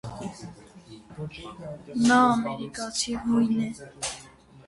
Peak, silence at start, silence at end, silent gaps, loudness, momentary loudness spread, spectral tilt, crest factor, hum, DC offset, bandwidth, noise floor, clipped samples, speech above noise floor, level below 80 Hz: -8 dBFS; 0.05 s; 0.05 s; none; -25 LUFS; 21 LU; -4 dB/octave; 20 dB; none; under 0.1%; 11.5 kHz; -50 dBFS; under 0.1%; 25 dB; -56 dBFS